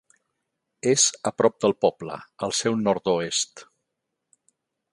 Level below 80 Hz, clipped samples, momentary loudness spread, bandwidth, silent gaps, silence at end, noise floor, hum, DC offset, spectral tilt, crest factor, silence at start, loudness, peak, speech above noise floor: -66 dBFS; under 0.1%; 12 LU; 11.5 kHz; none; 1.3 s; -81 dBFS; none; under 0.1%; -3 dB/octave; 22 dB; 0.85 s; -23 LUFS; -4 dBFS; 58 dB